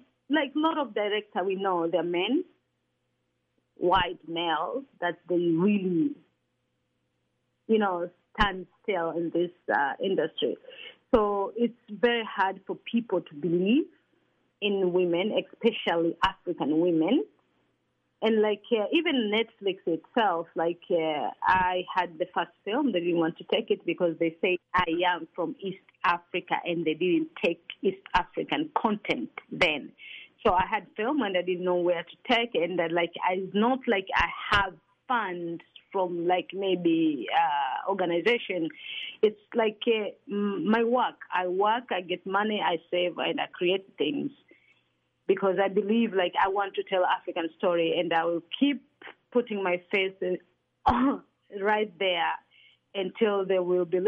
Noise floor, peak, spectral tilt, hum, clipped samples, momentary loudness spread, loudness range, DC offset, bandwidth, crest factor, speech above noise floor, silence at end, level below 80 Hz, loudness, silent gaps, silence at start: -77 dBFS; -10 dBFS; -7 dB/octave; none; under 0.1%; 7 LU; 3 LU; under 0.1%; 7.8 kHz; 18 dB; 50 dB; 0 s; -54 dBFS; -28 LUFS; none; 0.3 s